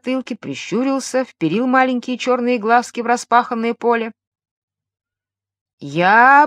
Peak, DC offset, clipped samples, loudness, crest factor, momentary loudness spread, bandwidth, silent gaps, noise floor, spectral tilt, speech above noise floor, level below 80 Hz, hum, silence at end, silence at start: 0 dBFS; under 0.1%; under 0.1%; -17 LUFS; 18 dB; 11 LU; 12.5 kHz; 4.27-4.32 s, 4.51-4.68 s, 5.61-5.66 s, 5.73-5.78 s; -88 dBFS; -4.5 dB/octave; 72 dB; -74 dBFS; none; 0 s; 0.05 s